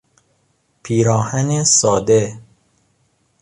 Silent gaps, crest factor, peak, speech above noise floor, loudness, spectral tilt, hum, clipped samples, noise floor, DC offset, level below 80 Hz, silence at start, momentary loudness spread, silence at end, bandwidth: none; 16 dB; -2 dBFS; 48 dB; -15 LUFS; -4.5 dB/octave; none; under 0.1%; -63 dBFS; under 0.1%; -50 dBFS; 0.85 s; 7 LU; 1 s; 11 kHz